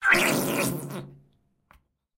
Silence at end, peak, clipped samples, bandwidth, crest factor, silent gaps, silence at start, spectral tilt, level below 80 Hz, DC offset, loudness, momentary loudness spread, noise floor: 1.05 s; -6 dBFS; under 0.1%; 16 kHz; 22 dB; none; 0 s; -3.5 dB/octave; -58 dBFS; under 0.1%; -24 LUFS; 18 LU; -64 dBFS